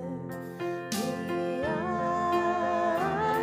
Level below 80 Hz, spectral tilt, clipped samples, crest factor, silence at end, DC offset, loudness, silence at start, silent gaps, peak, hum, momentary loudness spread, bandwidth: -64 dBFS; -5.5 dB/octave; under 0.1%; 14 dB; 0 s; under 0.1%; -30 LUFS; 0 s; none; -16 dBFS; none; 9 LU; 16 kHz